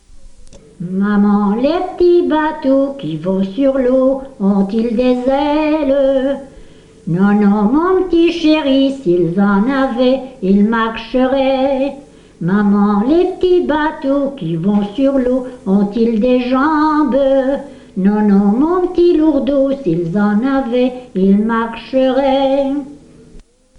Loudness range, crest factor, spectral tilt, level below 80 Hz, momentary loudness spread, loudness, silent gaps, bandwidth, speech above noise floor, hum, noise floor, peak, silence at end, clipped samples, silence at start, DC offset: 2 LU; 12 dB; -8 dB/octave; -40 dBFS; 6 LU; -14 LUFS; none; 7.4 kHz; 27 dB; 50 Hz at -50 dBFS; -41 dBFS; -2 dBFS; 0.35 s; under 0.1%; 0.15 s; under 0.1%